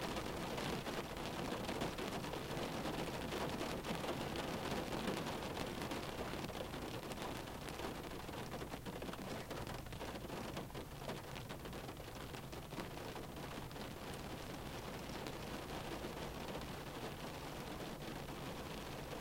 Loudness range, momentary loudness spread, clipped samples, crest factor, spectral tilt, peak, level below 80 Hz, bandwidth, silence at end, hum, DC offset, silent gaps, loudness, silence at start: 5 LU; 6 LU; under 0.1%; 22 dB; -4.5 dB/octave; -24 dBFS; -58 dBFS; 17 kHz; 0 s; none; under 0.1%; none; -45 LUFS; 0 s